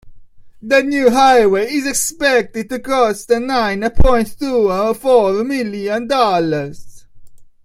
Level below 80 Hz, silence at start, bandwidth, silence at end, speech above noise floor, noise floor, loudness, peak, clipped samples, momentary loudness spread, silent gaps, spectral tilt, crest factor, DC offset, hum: -28 dBFS; 0.05 s; 16 kHz; 0.2 s; 23 dB; -37 dBFS; -15 LUFS; 0 dBFS; under 0.1%; 9 LU; none; -4 dB/octave; 14 dB; under 0.1%; none